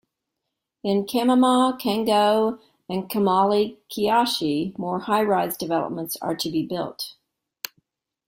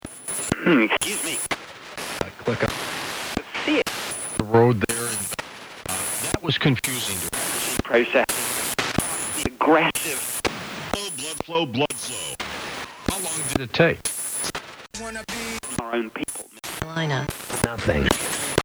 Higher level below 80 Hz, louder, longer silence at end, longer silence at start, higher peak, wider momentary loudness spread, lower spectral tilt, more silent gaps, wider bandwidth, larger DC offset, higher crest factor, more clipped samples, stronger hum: second, -64 dBFS vs -44 dBFS; about the same, -22 LUFS vs -24 LUFS; first, 1.15 s vs 0 s; first, 0.85 s vs 0.05 s; second, -6 dBFS vs -2 dBFS; about the same, 13 LU vs 12 LU; first, -5 dB/octave vs -3.5 dB/octave; neither; second, 16.5 kHz vs over 20 kHz; neither; second, 16 dB vs 22 dB; neither; neither